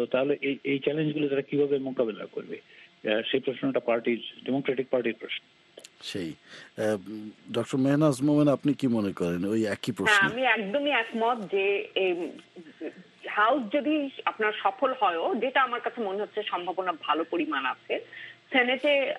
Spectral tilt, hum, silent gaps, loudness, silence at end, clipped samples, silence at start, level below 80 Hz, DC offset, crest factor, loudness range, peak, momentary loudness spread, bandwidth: -5.5 dB/octave; none; none; -27 LUFS; 0 s; under 0.1%; 0 s; -72 dBFS; under 0.1%; 20 dB; 6 LU; -8 dBFS; 14 LU; 12.5 kHz